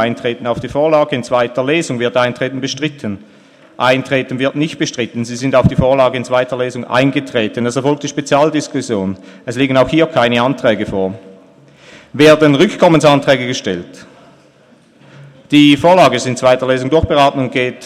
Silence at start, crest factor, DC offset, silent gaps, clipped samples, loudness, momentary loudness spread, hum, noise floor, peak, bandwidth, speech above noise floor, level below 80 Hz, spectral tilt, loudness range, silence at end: 0 s; 14 dB; under 0.1%; none; under 0.1%; -13 LUFS; 11 LU; none; -47 dBFS; 0 dBFS; 13.5 kHz; 34 dB; -40 dBFS; -5.5 dB/octave; 4 LU; 0 s